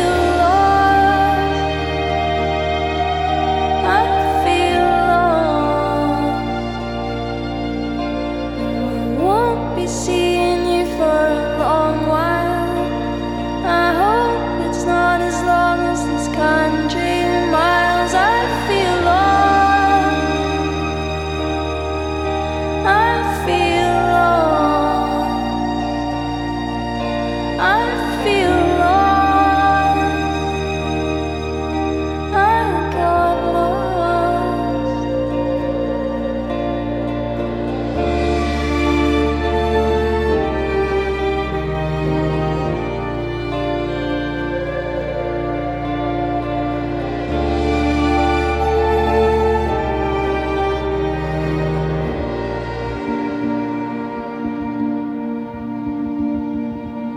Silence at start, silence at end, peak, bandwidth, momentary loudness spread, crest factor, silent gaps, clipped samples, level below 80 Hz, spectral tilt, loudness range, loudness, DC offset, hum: 0 s; 0 s; -2 dBFS; 16.5 kHz; 8 LU; 16 dB; none; under 0.1%; -30 dBFS; -6 dB/octave; 6 LU; -18 LUFS; under 0.1%; none